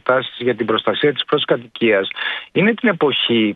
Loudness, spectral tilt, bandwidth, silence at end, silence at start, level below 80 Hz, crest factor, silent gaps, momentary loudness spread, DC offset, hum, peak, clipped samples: -17 LUFS; -8 dB/octave; 4.9 kHz; 0 s; 0.05 s; -62 dBFS; 16 dB; none; 5 LU; under 0.1%; none; -2 dBFS; under 0.1%